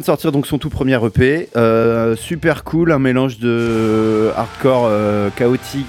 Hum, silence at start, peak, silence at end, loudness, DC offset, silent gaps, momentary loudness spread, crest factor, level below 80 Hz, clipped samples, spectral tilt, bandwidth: none; 0 s; -2 dBFS; 0 s; -15 LUFS; under 0.1%; none; 4 LU; 14 dB; -40 dBFS; under 0.1%; -7 dB/octave; 17 kHz